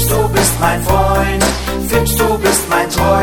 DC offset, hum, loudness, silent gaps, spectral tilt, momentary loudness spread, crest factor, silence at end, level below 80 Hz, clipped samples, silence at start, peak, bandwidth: under 0.1%; none; -13 LUFS; none; -4 dB/octave; 3 LU; 12 dB; 0 s; -22 dBFS; under 0.1%; 0 s; 0 dBFS; 17.5 kHz